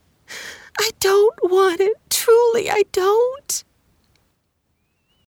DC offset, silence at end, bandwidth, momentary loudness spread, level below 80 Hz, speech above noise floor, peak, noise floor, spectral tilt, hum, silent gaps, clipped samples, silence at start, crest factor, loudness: under 0.1%; 1.75 s; over 20 kHz; 17 LU; -60 dBFS; 51 dB; -4 dBFS; -69 dBFS; -1.5 dB/octave; none; none; under 0.1%; 0.3 s; 16 dB; -17 LUFS